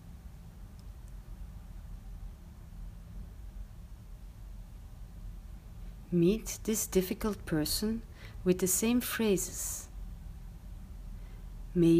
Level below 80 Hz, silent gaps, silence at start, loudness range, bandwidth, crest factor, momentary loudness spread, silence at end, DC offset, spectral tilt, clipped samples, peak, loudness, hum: -46 dBFS; none; 0 s; 19 LU; 15.5 kHz; 20 dB; 22 LU; 0 s; under 0.1%; -5 dB/octave; under 0.1%; -14 dBFS; -31 LUFS; none